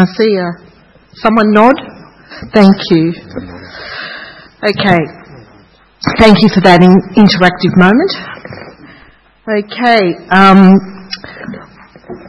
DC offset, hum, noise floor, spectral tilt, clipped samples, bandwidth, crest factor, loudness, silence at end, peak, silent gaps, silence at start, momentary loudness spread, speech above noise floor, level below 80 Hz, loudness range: under 0.1%; none; -44 dBFS; -7 dB/octave; 1%; 8.6 kHz; 10 dB; -8 LUFS; 0.1 s; 0 dBFS; none; 0 s; 22 LU; 35 dB; -40 dBFS; 5 LU